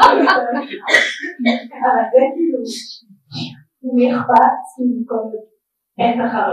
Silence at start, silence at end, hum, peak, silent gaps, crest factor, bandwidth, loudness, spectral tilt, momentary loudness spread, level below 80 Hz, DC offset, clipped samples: 0 s; 0 s; none; 0 dBFS; none; 16 dB; 12.5 kHz; -16 LUFS; -4 dB/octave; 16 LU; -58 dBFS; under 0.1%; under 0.1%